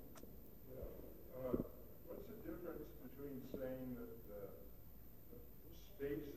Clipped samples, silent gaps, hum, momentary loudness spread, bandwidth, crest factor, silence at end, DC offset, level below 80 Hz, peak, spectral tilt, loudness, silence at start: under 0.1%; none; none; 15 LU; 14.5 kHz; 26 dB; 0 s; 0.1%; -62 dBFS; -26 dBFS; -7.5 dB/octave; -52 LUFS; 0 s